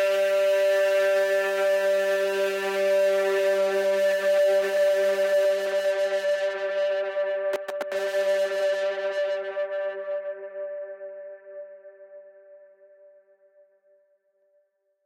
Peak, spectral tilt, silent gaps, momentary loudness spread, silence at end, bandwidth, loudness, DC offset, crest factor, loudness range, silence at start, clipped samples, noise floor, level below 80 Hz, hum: -14 dBFS; -2.5 dB/octave; none; 14 LU; 2.5 s; 16 kHz; -24 LUFS; under 0.1%; 12 dB; 15 LU; 0 s; under 0.1%; -69 dBFS; -90 dBFS; none